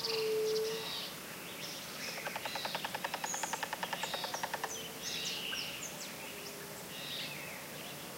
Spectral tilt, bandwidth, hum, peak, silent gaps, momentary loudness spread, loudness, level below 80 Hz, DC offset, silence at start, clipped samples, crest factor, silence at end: -1.5 dB/octave; 16 kHz; none; -20 dBFS; none; 9 LU; -39 LUFS; -72 dBFS; under 0.1%; 0 s; under 0.1%; 20 dB; 0 s